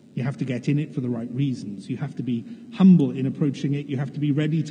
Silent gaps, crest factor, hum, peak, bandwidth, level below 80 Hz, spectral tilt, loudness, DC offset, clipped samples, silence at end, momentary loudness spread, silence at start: none; 16 dB; none; -6 dBFS; 8.8 kHz; -76 dBFS; -8.5 dB/octave; -24 LUFS; under 0.1%; under 0.1%; 0 s; 14 LU; 0.15 s